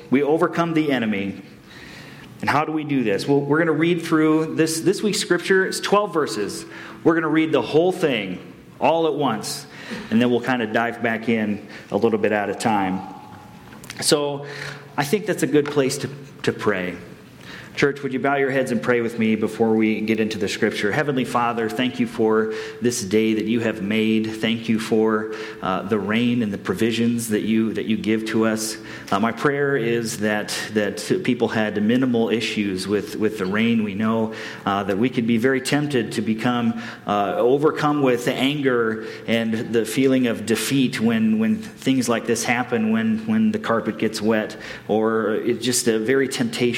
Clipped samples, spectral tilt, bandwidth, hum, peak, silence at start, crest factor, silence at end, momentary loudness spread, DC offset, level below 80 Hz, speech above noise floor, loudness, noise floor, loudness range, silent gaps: under 0.1%; -5 dB/octave; 16.5 kHz; none; -4 dBFS; 0 s; 16 dB; 0 s; 8 LU; under 0.1%; -62 dBFS; 20 dB; -21 LUFS; -41 dBFS; 3 LU; none